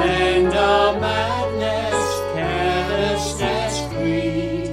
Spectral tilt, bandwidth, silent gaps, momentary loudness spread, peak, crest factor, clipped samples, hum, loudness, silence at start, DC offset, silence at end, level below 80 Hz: -4.5 dB/octave; 15.5 kHz; none; 6 LU; -4 dBFS; 16 dB; under 0.1%; none; -20 LUFS; 0 s; under 0.1%; 0 s; -36 dBFS